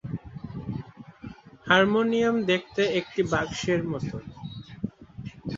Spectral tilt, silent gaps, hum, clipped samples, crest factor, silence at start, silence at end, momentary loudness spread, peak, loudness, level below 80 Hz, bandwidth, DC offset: -5.5 dB/octave; none; none; under 0.1%; 24 dB; 0.05 s; 0 s; 22 LU; -4 dBFS; -26 LUFS; -54 dBFS; 7.8 kHz; under 0.1%